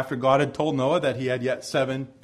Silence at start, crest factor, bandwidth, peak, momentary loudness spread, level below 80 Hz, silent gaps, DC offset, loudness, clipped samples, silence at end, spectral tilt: 0 s; 18 dB; 13 kHz; -6 dBFS; 5 LU; -60 dBFS; none; under 0.1%; -24 LUFS; under 0.1%; 0.15 s; -6 dB/octave